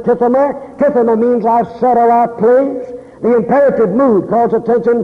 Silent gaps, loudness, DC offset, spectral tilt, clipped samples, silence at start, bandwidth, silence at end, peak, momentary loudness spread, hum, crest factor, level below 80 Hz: none; -12 LUFS; under 0.1%; -9.5 dB/octave; under 0.1%; 0 s; 5.2 kHz; 0 s; -2 dBFS; 6 LU; none; 8 dB; -50 dBFS